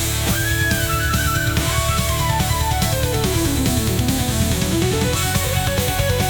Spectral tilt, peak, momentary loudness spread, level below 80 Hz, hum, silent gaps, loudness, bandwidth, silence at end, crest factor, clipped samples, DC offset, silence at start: -4 dB/octave; -4 dBFS; 1 LU; -28 dBFS; none; none; -19 LUFS; 19.5 kHz; 0 s; 14 dB; under 0.1%; under 0.1%; 0 s